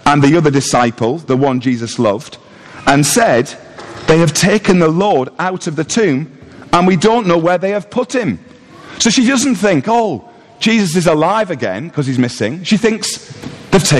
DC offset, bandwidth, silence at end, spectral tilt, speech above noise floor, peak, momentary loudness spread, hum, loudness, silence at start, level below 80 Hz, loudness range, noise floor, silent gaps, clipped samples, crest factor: under 0.1%; 13 kHz; 0 s; -4.5 dB/octave; 22 dB; 0 dBFS; 11 LU; none; -13 LUFS; 0.05 s; -42 dBFS; 2 LU; -35 dBFS; none; under 0.1%; 12 dB